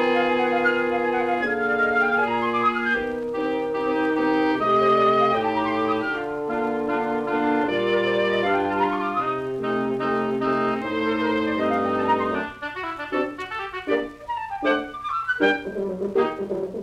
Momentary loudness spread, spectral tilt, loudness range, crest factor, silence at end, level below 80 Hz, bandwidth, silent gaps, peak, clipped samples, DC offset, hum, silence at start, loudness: 8 LU; -6 dB/octave; 4 LU; 16 dB; 0 s; -56 dBFS; 11.5 kHz; none; -6 dBFS; under 0.1%; under 0.1%; none; 0 s; -23 LUFS